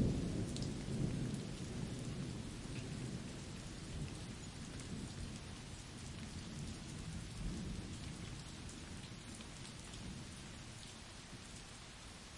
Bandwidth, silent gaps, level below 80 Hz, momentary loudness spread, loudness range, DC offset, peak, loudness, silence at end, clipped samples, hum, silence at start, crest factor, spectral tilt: 11.5 kHz; none; -54 dBFS; 10 LU; 6 LU; under 0.1%; -24 dBFS; -47 LUFS; 0 s; under 0.1%; none; 0 s; 22 dB; -5 dB/octave